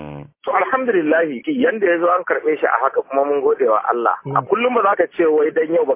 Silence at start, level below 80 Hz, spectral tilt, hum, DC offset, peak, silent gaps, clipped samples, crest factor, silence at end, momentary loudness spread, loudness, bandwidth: 0 s; -62 dBFS; -9.5 dB/octave; none; under 0.1%; -2 dBFS; none; under 0.1%; 16 dB; 0 s; 4 LU; -17 LUFS; 3.7 kHz